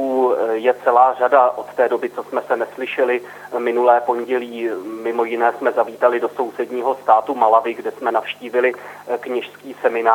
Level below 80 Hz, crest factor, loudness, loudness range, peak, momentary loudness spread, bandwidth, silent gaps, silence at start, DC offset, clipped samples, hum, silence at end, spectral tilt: -80 dBFS; 18 dB; -19 LUFS; 2 LU; 0 dBFS; 11 LU; 18.5 kHz; none; 0 s; under 0.1%; under 0.1%; 50 Hz at -55 dBFS; 0 s; -5 dB/octave